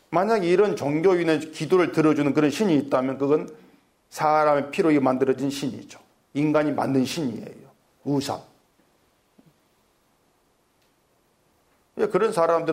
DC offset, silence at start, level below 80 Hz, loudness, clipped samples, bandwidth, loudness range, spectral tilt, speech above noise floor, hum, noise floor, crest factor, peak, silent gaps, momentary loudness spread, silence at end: under 0.1%; 0.1 s; -66 dBFS; -23 LUFS; under 0.1%; 16 kHz; 13 LU; -6 dB/octave; 44 dB; none; -65 dBFS; 16 dB; -8 dBFS; none; 13 LU; 0 s